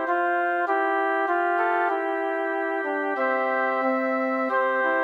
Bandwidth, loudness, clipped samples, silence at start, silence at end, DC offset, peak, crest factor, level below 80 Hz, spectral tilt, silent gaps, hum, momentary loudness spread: 8.8 kHz; -24 LUFS; under 0.1%; 0 s; 0 s; under 0.1%; -12 dBFS; 12 dB; under -90 dBFS; -4.5 dB/octave; none; none; 3 LU